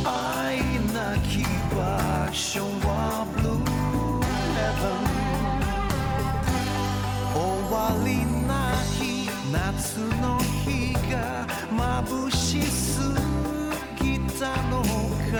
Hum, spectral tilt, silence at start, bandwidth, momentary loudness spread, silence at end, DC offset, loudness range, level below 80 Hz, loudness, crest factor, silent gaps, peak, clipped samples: none; -5 dB/octave; 0 s; over 20 kHz; 3 LU; 0 s; under 0.1%; 1 LU; -34 dBFS; -26 LUFS; 10 dB; none; -14 dBFS; under 0.1%